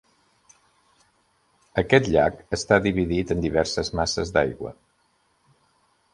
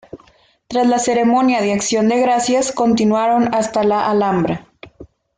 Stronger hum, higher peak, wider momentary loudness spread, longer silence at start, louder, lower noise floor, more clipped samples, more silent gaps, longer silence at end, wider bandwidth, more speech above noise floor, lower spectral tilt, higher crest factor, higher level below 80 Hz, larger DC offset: neither; about the same, -2 dBFS vs -4 dBFS; first, 10 LU vs 3 LU; first, 1.75 s vs 0.15 s; second, -23 LUFS vs -16 LUFS; first, -67 dBFS vs -52 dBFS; neither; neither; first, 1.4 s vs 0.3 s; first, 11.5 kHz vs 9.6 kHz; first, 44 dB vs 37 dB; about the same, -5 dB/octave vs -4.5 dB/octave; first, 24 dB vs 12 dB; first, -44 dBFS vs -52 dBFS; neither